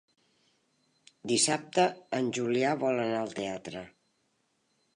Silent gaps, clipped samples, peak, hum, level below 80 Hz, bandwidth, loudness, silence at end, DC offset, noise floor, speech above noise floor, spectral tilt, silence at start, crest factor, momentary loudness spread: none; under 0.1%; -12 dBFS; none; -74 dBFS; 11 kHz; -29 LUFS; 1.05 s; under 0.1%; -75 dBFS; 45 dB; -3.5 dB/octave; 1.25 s; 20 dB; 14 LU